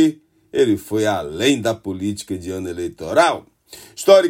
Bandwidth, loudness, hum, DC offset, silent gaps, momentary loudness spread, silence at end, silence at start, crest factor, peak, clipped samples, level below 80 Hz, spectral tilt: 16.5 kHz; -20 LUFS; none; under 0.1%; none; 11 LU; 0 s; 0 s; 18 dB; 0 dBFS; under 0.1%; -58 dBFS; -4.5 dB/octave